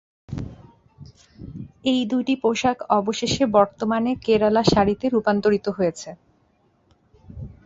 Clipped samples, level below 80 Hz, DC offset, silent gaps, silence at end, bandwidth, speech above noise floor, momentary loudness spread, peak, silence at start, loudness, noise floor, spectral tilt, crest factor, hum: under 0.1%; -48 dBFS; under 0.1%; none; 0.15 s; 8 kHz; 42 dB; 20 LU; -2 dBFS; 0.3 s; -21 LUFS; -63 dBFS; -5.5 dB/octave; 20 dB; none